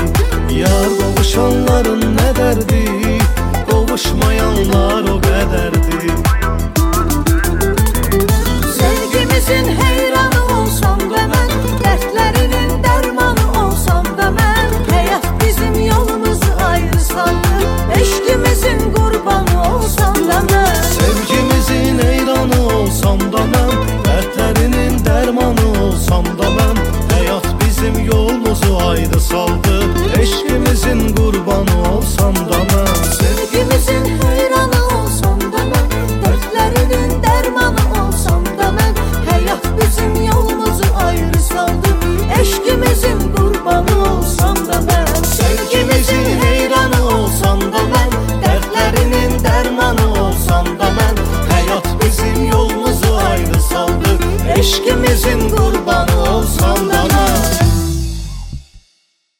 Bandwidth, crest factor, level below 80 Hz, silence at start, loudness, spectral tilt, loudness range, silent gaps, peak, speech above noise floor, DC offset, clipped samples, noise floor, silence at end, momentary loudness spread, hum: 17 kHz; 12 dB; -18 dBFS; 0 s; -13 LUFS; -5 dB/octave; 1 LU; none; 0 dBFS; 48 dB; under 0.1%; under 0.1%; -60 dBFS; 0.6 s; 3 LU; none